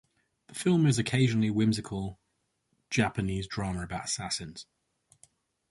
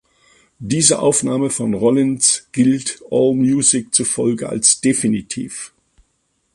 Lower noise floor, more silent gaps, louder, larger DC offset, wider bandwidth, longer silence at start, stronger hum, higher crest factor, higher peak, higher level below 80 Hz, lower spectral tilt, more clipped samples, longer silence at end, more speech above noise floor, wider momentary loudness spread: first, -78 dBFS vs -66 dBFS; neither; second, -29 LUFS vs -16 LUFS; neither; about the same, 11.5 kHz vs 11.5 kHz; about the same, 0.5 s vs 0.6 s; neither; about the same, 20 dB vs 18 dB; second, -12 dBFS vs 0 dBFS; about the same, -54 dBFS vs -54 dBFS; first, -5.5 dB/octave vs -3.5 dB/octave; neither; first, 1.1 s vs 0.9 s; about the same, 49 dB vs 50 dB; about the same, 13 LU vs 12 LU